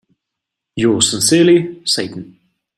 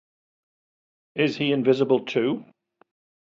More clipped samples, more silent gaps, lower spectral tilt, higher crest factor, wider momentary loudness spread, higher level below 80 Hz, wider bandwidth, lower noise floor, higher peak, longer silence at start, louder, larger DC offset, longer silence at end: neither; neither; second, -3.5 dB/octave vs -6.5 dB/octave; about the same, 16 dB vs 20 dB; first, 17 LU vs 9 LU; first, -54 dBFS vs -72 dBFS; first, 13.5 kHz vs 7.4 kHz; second, -80 dBFS vs under -90 dBFS; first, 0 dBFS vs -6 dBFS; second, 0.75 s vs 1.15 s; first, -13 LUFS vs -23 LUFS; neither; second, 0.55 s vs 0.8 s